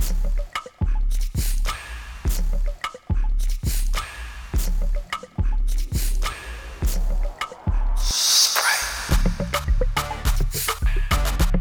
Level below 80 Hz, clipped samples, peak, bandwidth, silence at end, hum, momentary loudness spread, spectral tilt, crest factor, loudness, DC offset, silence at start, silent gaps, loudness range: -22 dBFS; under 0.1%; -4 dBFS; over 20 kHz; 0 s; none; 10 LU; -2.5 dB/octave; 16 dB; -24 LUFS; under 0.1%; 0 s; none; 7 LU